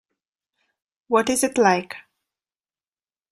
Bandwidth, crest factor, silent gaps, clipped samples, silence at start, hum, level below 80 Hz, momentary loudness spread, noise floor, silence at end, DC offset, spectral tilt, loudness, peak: 15.5 kHz; 22 dB; none; under 0.1%; 1.1 s; none; -64 dBFS; 18 LU; under -90 dBFS; 1.3 s; under 0.1%; -3.5 dB/octave; -20 LUFS; -4 dBFS